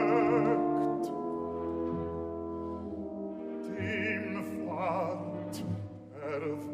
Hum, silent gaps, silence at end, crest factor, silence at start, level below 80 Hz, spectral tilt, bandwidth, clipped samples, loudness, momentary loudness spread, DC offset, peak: none; none; 0 s; 18 dB; 0 s; -60 dBFS; -7.5 dB/octave; 15 kHz; under 0.1%; -34 LUFS; 12 LU; under 0.1%; -16 dBFS